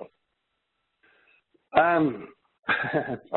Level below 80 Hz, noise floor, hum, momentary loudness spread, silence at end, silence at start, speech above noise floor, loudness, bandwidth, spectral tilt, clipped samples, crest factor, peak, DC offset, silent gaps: -64 dBFS; -78 dBFS; none; 12 LU; 0 s; 0 s; 53 dB; -25 LUFS; 4.3 kHz; -10 dB/octave; under 0.1%; 24 dB; -4 dBFS; under 0.1%; none